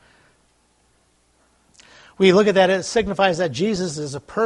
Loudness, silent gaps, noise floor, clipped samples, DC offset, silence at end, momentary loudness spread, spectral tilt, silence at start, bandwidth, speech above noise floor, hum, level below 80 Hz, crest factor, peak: -19 LUFS; none; -61 dBFS; under 0.1%; under 0.1%; 0 s; 11 LU; -5 dB/octave; 2.2 s; 11 kHz; 43 dB; none; -52 dBFS; 20 dB; -2 dBFS